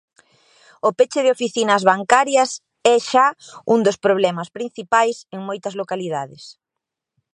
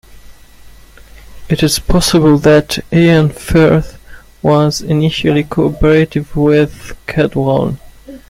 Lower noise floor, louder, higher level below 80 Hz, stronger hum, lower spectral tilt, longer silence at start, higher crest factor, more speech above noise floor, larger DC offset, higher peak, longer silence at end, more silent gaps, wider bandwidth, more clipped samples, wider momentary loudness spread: first, -83 dBFS vs -37 dBFS; second, -18 LUFS vs -12 LUFS; second, -70 dBFS vs -28 dBFS; neither; second, -3.5 dB/octave vs -6 dB/octave; first, 0.85 s vs 0.3 s; first, 20 dB vs 12 dB; first, 65 dB vs 26 dB; neither; about the same, 0 dBFS vs 0 dBFS; first, 0.85 s vs 0.15 s; neither; second, 11 kHz vs 16 kHz; neither; first, 13 LU vs 9 LU